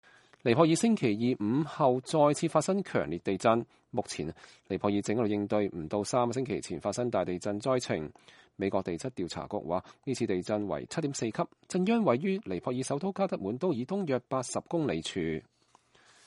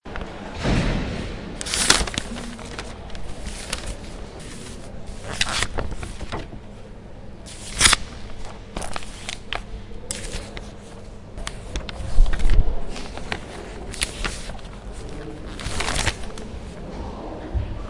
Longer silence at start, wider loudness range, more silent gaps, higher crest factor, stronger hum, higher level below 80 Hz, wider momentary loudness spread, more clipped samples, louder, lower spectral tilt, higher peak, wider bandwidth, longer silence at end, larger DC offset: first, 0.45 s vs 0.05 s; second, 6 LU vs 9 LU; neither; about the same, 22 dB vs 24 dB; neither; second, -64 dBFS vs -28 dBFS; second, 9 LU vs 17 LU; neither; second, -31 LUFS vs -26 LUFS; first, -5.5 dB/octave vs -2.5 dB/octave; second, -8 dBFS vs 0 dBFS; about the same, 11.5 kHz vs 11.5 kHz; first, 0.85 s vs 0 s; neither